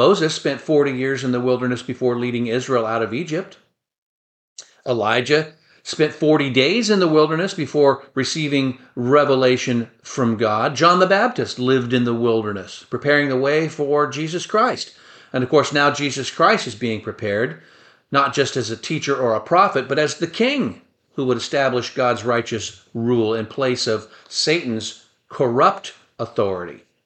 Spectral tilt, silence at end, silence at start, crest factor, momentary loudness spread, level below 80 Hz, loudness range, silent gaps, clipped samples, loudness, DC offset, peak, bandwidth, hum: -5 dB/octave; 0.3 s; 0 s; 18 dB; 11 LU; -62 dBFS; 4 LU; 3.98-4.56 s; under 0.1%; -19 LUFS; under 0.1%; -2 dBFS; 9 kHz; none